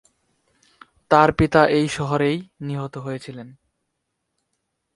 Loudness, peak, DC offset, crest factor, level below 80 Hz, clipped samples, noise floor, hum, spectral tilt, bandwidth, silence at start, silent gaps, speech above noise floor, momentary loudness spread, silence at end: -20 LUFS; 0 dBFS; under 0.1%; 22 dB; -46 dBFS; under 0.1%; -77 dBFS; none; -6.5 dB/octave; 11.5 kHz; 1.1 s; none; 57 dB; 16 LU; 1.45 s